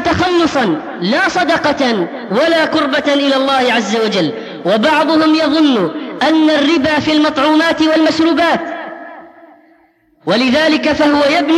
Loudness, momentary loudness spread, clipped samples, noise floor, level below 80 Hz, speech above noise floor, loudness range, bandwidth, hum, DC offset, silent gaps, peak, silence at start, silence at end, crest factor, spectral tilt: -12 LUFS; 7 LU; under 0.1%; -52 dBFS; -46 dBFS; 40 dB; 3 LU; 11.5 kHz; none; under 0.1%; none; -2 dBFS; 0 s; 0 s; 12 dB; -4.5 dB/octave